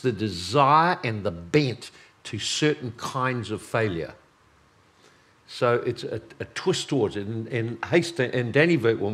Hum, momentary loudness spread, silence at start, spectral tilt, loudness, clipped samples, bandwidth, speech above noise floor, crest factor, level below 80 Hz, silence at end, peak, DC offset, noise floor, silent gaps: none; 15 LU; 0 s; -5 dB/octave; -25 LUFS; under 0.1%; 13.5 kHz; 34 dB; 22 dB; -60 dBFS; 0 s; -4 dBFS; under 0.1%; -59 dBFS; none